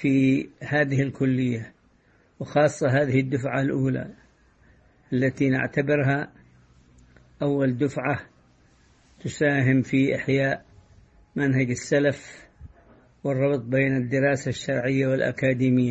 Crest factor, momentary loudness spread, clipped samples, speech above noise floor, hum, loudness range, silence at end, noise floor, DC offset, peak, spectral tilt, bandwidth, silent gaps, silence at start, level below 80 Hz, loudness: 18 dB; 11 LU; under 0.1%; 38 dB; none; 3 LU; 0 s; -60 dBFS; under 0.1%; -8 dBFS; -7 dB/octave; 8.6 kHz; none; 0 s; -56 dBFS; -24 LUFS